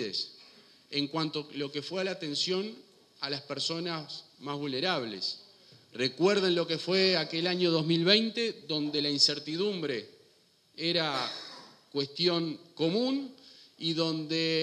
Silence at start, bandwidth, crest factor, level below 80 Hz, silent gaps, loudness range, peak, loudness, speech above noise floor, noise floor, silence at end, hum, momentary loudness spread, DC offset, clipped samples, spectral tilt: 0 s; 12 kHz; 22 dB; -80 dBFS; none; 7 LU; -8 dBFS; -30 LUFS; 35 dB; -65 dBFS; 0 s; none; 13 LU; under 0.1%; under 0.1%; -4.5 dB/octave